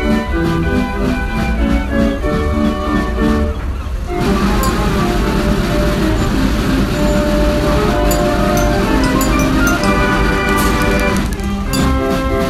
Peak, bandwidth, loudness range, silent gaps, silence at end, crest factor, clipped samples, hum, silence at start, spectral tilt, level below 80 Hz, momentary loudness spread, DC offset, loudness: 0 dBFS; 15 kHz; 3 LU; none; 0 s; 14 dB; under 0.1%; none; 0 s; -5.5 dB/octave; -20 dBFS; 4 LU; under 0.1%; -15 LUFS